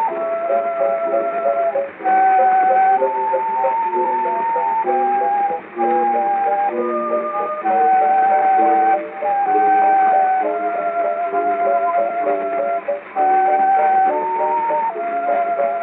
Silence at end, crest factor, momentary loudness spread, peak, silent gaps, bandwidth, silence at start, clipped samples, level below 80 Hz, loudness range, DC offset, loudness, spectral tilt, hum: 0 s; 10 dB; 7 LU; -6 dBFS; none; 3.9 kHz; 0 s; under 0.1%; -78 dBFS; 3 LU; under 0.1%; -17 LUFS; -3.5 dB/octave; none